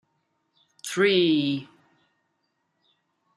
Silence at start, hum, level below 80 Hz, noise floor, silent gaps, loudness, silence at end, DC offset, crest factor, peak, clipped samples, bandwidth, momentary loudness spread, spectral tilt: 0.85 s; none; -76 dBFS; -75 dBFS; none; -23 LUFS; 1.7 s; under 0.1%; 20 dB; -8 dBFS; under 0.1%; 13.5 kHz; 13 LU; -4.5 dB/octave